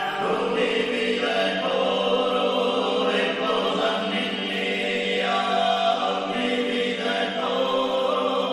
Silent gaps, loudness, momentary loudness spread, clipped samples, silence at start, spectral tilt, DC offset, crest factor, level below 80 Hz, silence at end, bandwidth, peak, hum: none; -23 LUFS; 3 LU; under 0.1%; 0 s; -4 dB/octave; under 0.1%; 14 dB; -62 dBFS; 0 s; 12 kHz; -10 dBFS; none